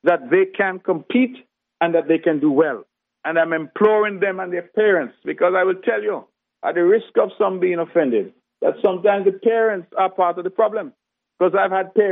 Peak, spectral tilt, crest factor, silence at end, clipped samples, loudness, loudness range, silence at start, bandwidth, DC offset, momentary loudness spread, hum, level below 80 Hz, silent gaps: -4 dBFS; -4.5 dB/octave; 16 dB; 0 s; under 0.1%; -19 LUFS; 1 LU; 0.05 s; 3.9 kHz; under 0.1%; 7 LU; none; -78 dBFS; none